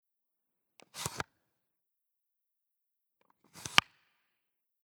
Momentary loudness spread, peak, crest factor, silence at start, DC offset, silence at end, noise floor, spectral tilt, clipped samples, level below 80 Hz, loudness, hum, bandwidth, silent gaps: 18 LU; 0 dBFS; 40 dB; 0.95 s; under 0.1%; 1.05 s; -86 dBFS; -1 dB/octave; under 0.1%; -68 dBFS; -32 LUFS; none; over 20 kHz; none